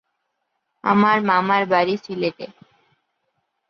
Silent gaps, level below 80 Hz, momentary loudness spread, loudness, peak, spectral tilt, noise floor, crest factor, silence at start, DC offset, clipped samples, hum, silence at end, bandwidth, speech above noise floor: none; -68 dBFS; 12 LU; -19 LUFS; -4 dBFS; -7 dB/octave; -75 dBFS; 18 dB; 0.85 s; under 0.1%; under 0.1%; none; 1.25 s; 6.4 kHz; 56 dB